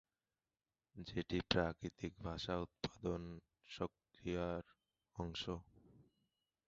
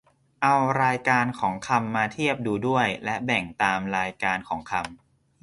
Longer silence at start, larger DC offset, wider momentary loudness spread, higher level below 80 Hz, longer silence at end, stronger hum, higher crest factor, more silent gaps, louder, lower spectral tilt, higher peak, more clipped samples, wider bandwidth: first, 0.95 s vs 0.4 s; neither; first, 16 LU vs 8 LU; about the same, -60 dBFS vs -58 dBFS; first, 0.65 s vs 0.45 s; neither; first, 28 dB vs 20 dB; neither; second, -44 LUFS vs -25 LUFS; about the same, -4.5 dB/octave vs -5 dB/octave; second, -18 dBFS vs -6 dBFS; neither; second, 7.6 kHz vs 11.5 kHz